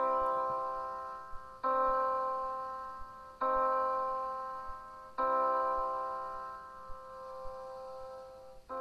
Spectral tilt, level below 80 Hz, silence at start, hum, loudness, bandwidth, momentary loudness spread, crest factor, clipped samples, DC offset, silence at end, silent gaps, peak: -5.5 dB/octave; -58 dBFS; 0 s; none; -35 LUFS; 12 kHz; 17 LU; 14 dB; under 0.1%; under 0.1%; 0 s; none; -20 dBFS